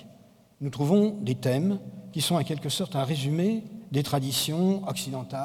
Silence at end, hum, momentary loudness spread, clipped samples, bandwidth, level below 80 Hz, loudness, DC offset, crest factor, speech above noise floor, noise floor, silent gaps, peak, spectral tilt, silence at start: 0 s; none; 9 LU; under 0.1%; 17.5 kHz; -64 dBFS; -27 LUFS; under 0.1%; 18 dB; 29 dB; -55 dBFS; none; -10 dBFS; -5.5 dB/octave; 0 s